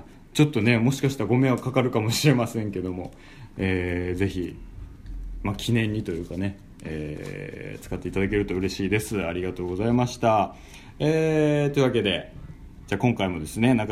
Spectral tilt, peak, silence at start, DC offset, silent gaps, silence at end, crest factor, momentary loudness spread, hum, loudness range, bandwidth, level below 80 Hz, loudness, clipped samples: -6 dB/octave; -6 dBFS; 0 s; under 0.1%; none; 0 s; 20 dB; 19 LU; none; 6 LU; 16 kHz; -44 dBFS; -25 LUFS; under 0.1%